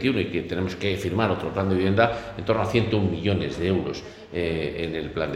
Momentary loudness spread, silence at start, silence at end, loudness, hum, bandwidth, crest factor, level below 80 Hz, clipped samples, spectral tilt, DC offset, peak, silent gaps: 7 LU; 0 s; 0 s; -25 LUFS; none; 12.5 kHz; 22 dB; -46 dBFS; under 0.1%; -7 dB/octave; under 0.1%; -2 dBFS; none